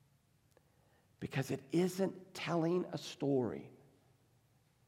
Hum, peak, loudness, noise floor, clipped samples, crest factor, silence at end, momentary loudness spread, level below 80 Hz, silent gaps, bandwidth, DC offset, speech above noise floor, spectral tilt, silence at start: none; -22 dBFS; -38 LUFS; -72 dBFS; under 0.1%; 18 dB; 1.15 s; 9 LU; -78 dBFS; none; 16.5 kHz; under 0.1%; 36 dB; -6.5 dB/octave; 1.2 s